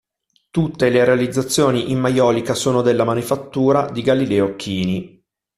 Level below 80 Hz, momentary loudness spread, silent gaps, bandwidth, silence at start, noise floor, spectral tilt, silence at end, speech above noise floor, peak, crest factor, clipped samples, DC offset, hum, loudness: -52 dBFS; 7 LU; none; 14.5 kHz; 0.55 s; -65 dBFS; -5.5 dB/octave; 0.5 s; 48 dB; -2 dBFS; 16 dB; under 0.1%; under 0.1%; none; -18 LUFS